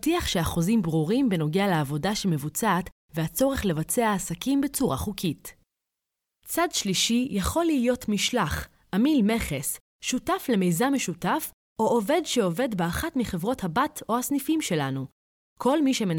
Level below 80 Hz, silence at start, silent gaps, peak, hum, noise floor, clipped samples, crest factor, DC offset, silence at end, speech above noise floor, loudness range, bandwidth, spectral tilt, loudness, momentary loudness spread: -46 dBFS; 0.05 s; 2.92-3.09 s, 9.80-9.99 s, 11.54-11.76 s, 15.12-15.56 s; -10 dBFS; none; -85 dBFS; under 0.1%; 16 dB; under 0.1%; 0 s; 60 dB; 2 LU; 19.5 kHz; -4.5 dB/octave; -26 LUFS; 7 LU